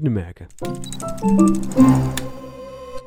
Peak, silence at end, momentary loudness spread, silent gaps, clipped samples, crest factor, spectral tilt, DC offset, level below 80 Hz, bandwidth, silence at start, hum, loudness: 0 dBFS; 0 s; 21 LU; none; under 0.1%; 18 dB; -7 dB/octave; under 0.1%; -38 dBFS; 20 kHz; 0 s; none; -18 LUFS